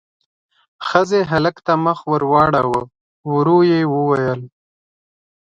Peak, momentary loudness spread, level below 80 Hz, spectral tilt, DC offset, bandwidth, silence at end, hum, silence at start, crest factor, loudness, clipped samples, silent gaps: 0 dBFS; 9 LU; -52 dBFS; -7 dB/octave; under 0.1%; 8 kHz; 1 s; none; 0.8 s; 18 dB; -16 LUFS; under 0.1%; 3.01-3.24 s